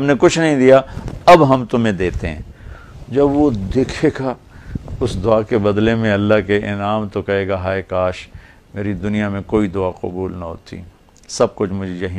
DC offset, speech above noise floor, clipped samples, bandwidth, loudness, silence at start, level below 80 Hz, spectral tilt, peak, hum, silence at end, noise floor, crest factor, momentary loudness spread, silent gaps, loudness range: under 0.1%; 20 dB; under 0.1%; 12.5 kHz; -16 LUFS; 0 s; -36 dBFS; -6.5 dB/octave; 0 dBFS; none; 0 s; -35 dBFS; 16 dB; 18 LU; none; 7 LU